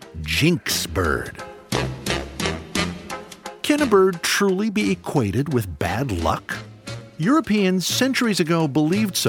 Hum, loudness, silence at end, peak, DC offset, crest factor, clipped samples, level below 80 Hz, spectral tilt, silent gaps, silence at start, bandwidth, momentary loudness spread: none; -21 LUFS; 0 s; -4 dBFS; under 0.1%; 18 dB; under 0.1%; -42 dBFS; -4.5 dB/octave; none; 0 s; 19.5 kHz; 14 LU